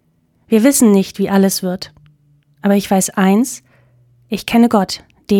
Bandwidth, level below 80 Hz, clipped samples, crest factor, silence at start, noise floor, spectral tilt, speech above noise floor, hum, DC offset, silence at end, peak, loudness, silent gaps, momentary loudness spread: 18 kHz; -52 dBFS; under 0.1%; 14 dB; 0.5 s; -54 dBFS; -5 dB/octave; 40 dB; none; under 0.1%; 0 s; 0 dBFS; -14 LUFS; none; 15 LU